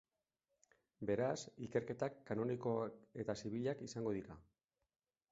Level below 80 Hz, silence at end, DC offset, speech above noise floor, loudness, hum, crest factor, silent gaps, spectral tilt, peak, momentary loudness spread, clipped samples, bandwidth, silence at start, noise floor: -74 dBFS; 0.9 s; under 0.1%; 47 dB; -43 LUFS; none; 20 dB; none; -6.5 dB/octave; -24 dBFS; 8 LU; under 0.1%; 7.6 kHz; 1 s; -89 dBFS